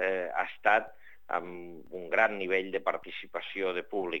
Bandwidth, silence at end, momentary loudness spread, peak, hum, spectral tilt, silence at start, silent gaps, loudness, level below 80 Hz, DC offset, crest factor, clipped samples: 16.5 kHz; 0 s; 17 LU; -8 dBFS; none; -5 dB/octave; 0 s; none; -31 LUFS; -72 dBFS; 0.4%; 22 dB; under 0.1%